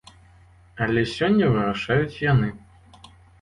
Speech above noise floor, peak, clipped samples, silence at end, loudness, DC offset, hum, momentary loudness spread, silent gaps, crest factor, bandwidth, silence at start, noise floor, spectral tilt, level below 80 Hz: 31 dB; -8 dBFS; under 0.1%; 0.85 s; -22 LUFS; under 0.1%; none; 5 LU; none; 16 dB; 11 kHz; 0.75 s; -52 dBFS; -7.5 dB/octave; -48 dBFS